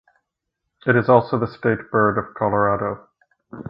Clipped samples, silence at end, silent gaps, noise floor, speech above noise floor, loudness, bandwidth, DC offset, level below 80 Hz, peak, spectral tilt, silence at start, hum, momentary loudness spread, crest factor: under 0.1%; 0.1 s; none; -79 dBFS; 60 dB; -20 LUFS; 5.6 kHz; under 0.1%; -52 dBFS; 0 dBFS; -11 dB/octave; 0.85 s; none; 10 LU; 20 dB